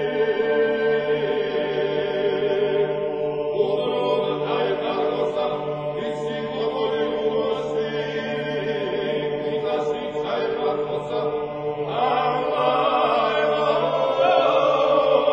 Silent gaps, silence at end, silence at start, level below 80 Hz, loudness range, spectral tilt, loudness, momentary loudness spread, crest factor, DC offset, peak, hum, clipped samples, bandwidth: none; 0 s; 0 s; -58 dBFS; 5 LU; -6.5 dB/octave; -22 LUFS; 7 LU; 16 dB; under 0.1%; -6 dBFS; none; under 0.1%; 7.6 kHz